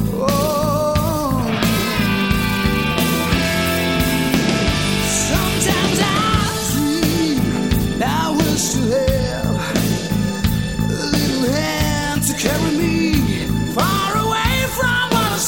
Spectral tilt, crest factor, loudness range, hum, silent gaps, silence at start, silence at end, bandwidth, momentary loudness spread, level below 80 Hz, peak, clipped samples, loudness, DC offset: -4.5 dB/octave; 16 dB; 2 LU; none; none; 0 s; 0 s; 17 kHz; 3 LU; -30 dBFS; -2 dBFS; under 0.1%; -17 LUFS; 0.5%